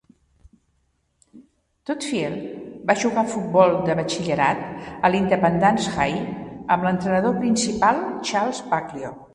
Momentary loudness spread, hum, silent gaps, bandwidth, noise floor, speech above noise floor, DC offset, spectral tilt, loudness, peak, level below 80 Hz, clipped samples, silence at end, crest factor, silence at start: 13 LU; none; none; 11.5 kHz; -68 dBFS; 47 dB; under 0.1%; -5 dB/octave; -22 LUFS; -2 dBFS; -52 dBFS; under 0.1%; 0.1 s; 20 dB; 1.35 s